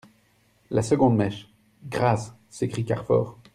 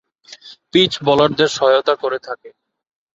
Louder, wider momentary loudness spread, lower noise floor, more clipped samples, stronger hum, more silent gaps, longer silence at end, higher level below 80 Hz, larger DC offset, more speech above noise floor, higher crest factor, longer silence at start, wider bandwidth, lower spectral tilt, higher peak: second, -25 LUFS vs -16 LUFS; about the same, 12 LU vs 13 LU; first, -63 dBFS vs -42 dBFS; neither; neither; neither; second, 0.2 s vs 0.65 s; about the same, -56 dBFS vs -56 dBFS; neither; first, 40 dB vs 26 dB; about the same, 18 dB vs 18 dB; first, 0.7 s vs 0.45 s; first, 12 kHz vs 8 kHz; first, -7 dB/octave vs -4.5 dB/octave; second, -6 dBFS vs -2 dBFS